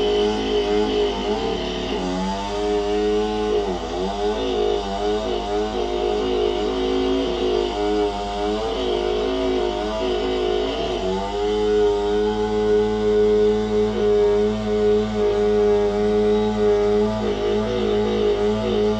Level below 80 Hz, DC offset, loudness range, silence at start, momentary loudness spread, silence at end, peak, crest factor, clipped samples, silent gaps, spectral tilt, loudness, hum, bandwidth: -36 dBFS; under 0.1%; 4 LU; 0 s; 5 LU; 0 s; -8 dBFS; 12 dB; under 0.1%; none; -5.5 dB/octave; -21 LUFS; none; 8.8 kHz